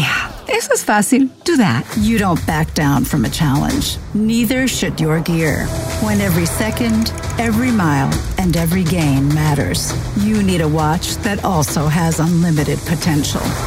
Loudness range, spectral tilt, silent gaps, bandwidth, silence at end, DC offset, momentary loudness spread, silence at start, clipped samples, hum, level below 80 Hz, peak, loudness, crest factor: 1 LU; -5 dB/octave; none; 16.5 kHz; 0 s; under 0.1%; 4 LU; 0 s; under 0.1%; none; -30 dBFS; -2 dBFS; -16 LUFS; 14 dB